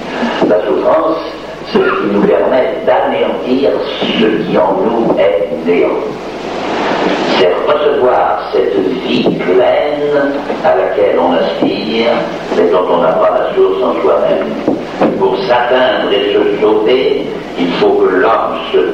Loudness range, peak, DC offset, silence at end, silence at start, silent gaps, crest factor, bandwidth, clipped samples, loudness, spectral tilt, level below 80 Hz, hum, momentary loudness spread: 1 LU; 0 dBFS; under 0.1%; 0 s; 0 s; none; 12 dB; 8.4 kHz; under 0.1%; -12 LUFS; -6 dB/octave; -44 dBFS; none; 6 LU